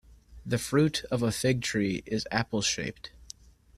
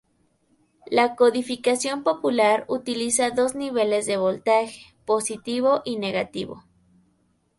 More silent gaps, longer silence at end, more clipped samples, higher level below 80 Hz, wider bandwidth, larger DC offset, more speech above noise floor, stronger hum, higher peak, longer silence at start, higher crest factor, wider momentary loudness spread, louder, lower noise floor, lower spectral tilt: neither; second, 0.55 s vs 1 s; neither; first, -54 dBFS vs -64 dBFS; first, 15 kHz vs 11.5 kHz; neither; second, 23 dB vs 44 dB; neither; second, -10 dBFS vs -6 dBFS; second, 0.1 s vs 0.9 s; about the same, 20 dB vs 18 dB; first, 20 LU vs 7 LU; second, -29 LUFS vs -23 LUFS; second, -51 dBFS vs -66 dBFS; first, -4.5 dB/octave vs -3 dB/octave